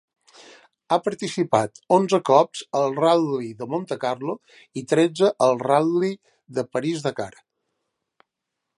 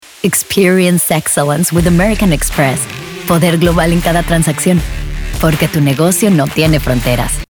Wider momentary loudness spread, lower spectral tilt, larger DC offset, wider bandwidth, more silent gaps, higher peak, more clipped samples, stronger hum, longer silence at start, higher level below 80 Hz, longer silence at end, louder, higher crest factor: first, 13 LU vs 5 LU; about the same, -5.5 dB/octave vs -5 dB/octave; neither; second, 11.5 kHz vs over 20 kHz; neither; about the same, -2 dBFS vs 0 dBFS; neither; neither; first, 0.9 s vs 0.25 s; second, -70 dBFS vs -24 dBFS; first, 1.5 s vs 0.05 s; second, -22 LUFS vs -12 LUFS; first, 22 dB vs 12 dB